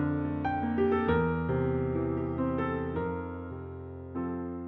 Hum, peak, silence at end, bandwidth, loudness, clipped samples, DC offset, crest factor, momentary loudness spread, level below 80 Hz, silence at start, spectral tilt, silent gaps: none; -16 dBFS; 0 s; 4.3 kHz; -31 LUFS; under 0.1%; under 0.1%; 16 dB; 13 LU; -48 dBFS; 0 s; -7.5 dB/octave; none